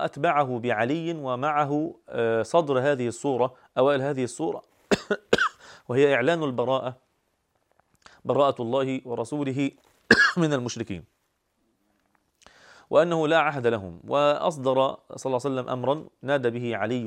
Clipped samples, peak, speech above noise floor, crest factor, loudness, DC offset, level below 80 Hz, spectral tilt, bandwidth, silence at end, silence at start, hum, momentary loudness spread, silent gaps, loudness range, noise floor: under 0.1%; -2 dBFS; 48 dB; 24 dB; -25 LUFS; under 0.1%; -64 dBFS; -5.5 dB/octave; 11.5 kHz; 0 s; 0 s; none; 9 LU; none; 3 LU; -73 dBFS